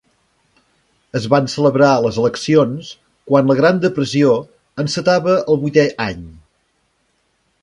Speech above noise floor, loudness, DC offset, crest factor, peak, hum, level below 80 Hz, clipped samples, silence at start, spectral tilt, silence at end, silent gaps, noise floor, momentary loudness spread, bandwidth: 49 dB; -15 LUFS; under 0.1%; 16 dB; 0 dBFS; none; -50 dBFS; under 0.1%; 1.15 s; -6 dB/octave; 1.3 s; none; -64 dBFS; 11 LU; 11 kHz